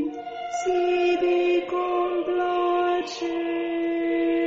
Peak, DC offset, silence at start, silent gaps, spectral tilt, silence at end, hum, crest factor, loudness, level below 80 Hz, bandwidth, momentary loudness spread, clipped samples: -14 dBFS; under 0.1%; 0 s; none; -1.5 dB/octave; 0 s; none; 10 dB; -24 LUFS; -62 dBFS; 7.6 kHz; 7 LU; under 0.1%